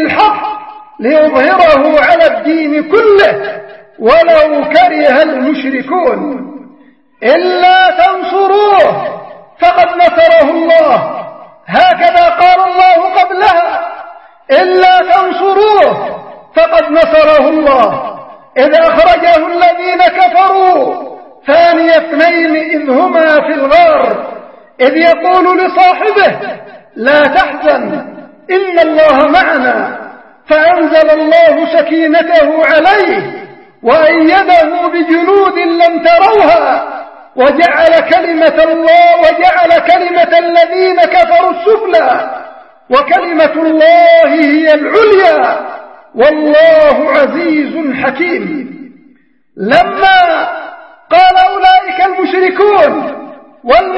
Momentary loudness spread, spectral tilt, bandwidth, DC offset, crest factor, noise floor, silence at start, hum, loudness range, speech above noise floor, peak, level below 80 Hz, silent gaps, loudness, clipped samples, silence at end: 13 LU; -5.5 dB/octave; 6.2 kHz; 0.2%; 8 dB; -47 dBFS; 0 s; none; 3 LU; 40 dB; 0 dBFS; -42 dBFS; none; -7 LUFS; 0.7%; 0 s